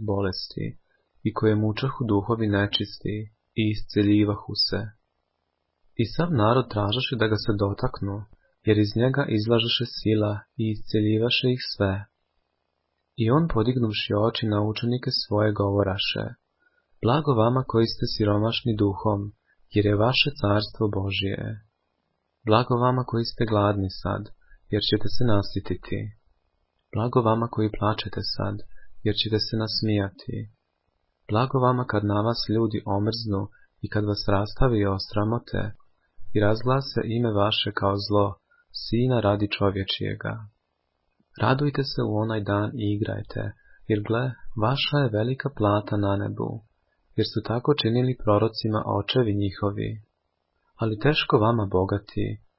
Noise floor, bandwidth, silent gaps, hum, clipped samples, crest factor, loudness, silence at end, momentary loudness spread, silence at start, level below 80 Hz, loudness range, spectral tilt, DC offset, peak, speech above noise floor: -76 dBFS; 5.8 kHz; none; none; under 0.1%; 22 dB; -25 LUFS; 0.2 s; 11 LU; 0 s; -46 dBFS; 3 LU; -10 dB/octave; under 0.1%; -4 dBFS; 53 dB